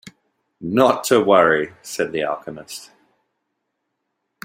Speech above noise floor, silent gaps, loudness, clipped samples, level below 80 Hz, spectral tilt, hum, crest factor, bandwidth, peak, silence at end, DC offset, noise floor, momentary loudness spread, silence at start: 57 dB; none; -18 LUFS; under 0.1%; -62 dBFS; -4.5 dB/octave; none; 20 dB; 16 kHz; -2 dBFS; 1.6 s; under 0.1%; -76 dBFS; 19 LU; 0.05 s